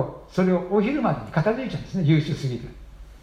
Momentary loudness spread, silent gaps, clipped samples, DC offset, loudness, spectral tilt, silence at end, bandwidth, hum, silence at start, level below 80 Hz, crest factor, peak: 9 LU; none; under 0.1%; under 0.1%; -24 LUFS; -8 dB/octave; 0.05 s; 9.6 kHz; none; 0 s; -46 dBFS; 16 dB; -8 dBFS